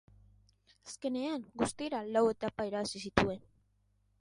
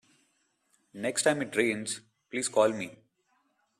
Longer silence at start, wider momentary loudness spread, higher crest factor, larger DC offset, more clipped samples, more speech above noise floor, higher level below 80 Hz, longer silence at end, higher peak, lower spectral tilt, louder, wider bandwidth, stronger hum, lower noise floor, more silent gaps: about the same, 0.85 s vs 0.95 s; about the same, 11 LU vs 12 LU; first, 28 dB vs 22 dB; neither; neither; second, 39 dB vs 45 dB; first, -58 dBFS vs -76 dBFS; about the same, 0.8 s vs 0.85 s; about the same, -8 dBFS vs -10 dBFS; first, -5 dB/octave vs -3 dB/octave; second, -35 LUFS vs -29 LUFS; second, 11.5 kHz vs 13.5 kHz; first, 50 Hz at -65 dBFS vs none; about the same, -73 dBFS vs -73 dBFS; neither